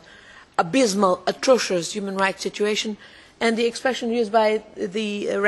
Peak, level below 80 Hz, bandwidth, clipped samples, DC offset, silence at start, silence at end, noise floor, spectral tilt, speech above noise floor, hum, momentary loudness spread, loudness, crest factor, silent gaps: -4 dBFS; -62 dBFS; 12.5 kHz; under 0.1%; under 0.1%; 0.3 s; 0 s; -47 dBFS; -3.5 dB/octave; 25 dB; none; 8 LU; -22 LUFS; 18 dB; none